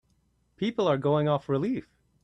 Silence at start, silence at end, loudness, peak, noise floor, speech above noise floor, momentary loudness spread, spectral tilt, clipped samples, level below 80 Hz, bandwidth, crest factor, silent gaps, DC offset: 0.6 s; 0.4 s; -27 LUFS; -12 dBFS; -69 dBFS; 43 dB; 8 LU; -8 dB/octave; under 0.1%; -64 dBFS; 8.2 kHz; 16 dB; none; under 0.1%